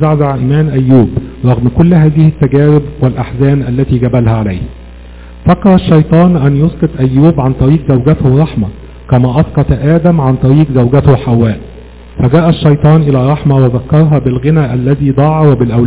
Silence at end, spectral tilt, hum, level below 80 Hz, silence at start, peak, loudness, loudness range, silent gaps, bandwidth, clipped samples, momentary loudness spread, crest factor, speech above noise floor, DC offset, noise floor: 0 s; -13 dB/octave; none; -26 dBFS; 0 s; 0 dBFS; -9 LUFS; 1 LU; none; 4 kHz; 4%; 6 LU; 8 dB; 22 dB; 0.5%; -30 dBFS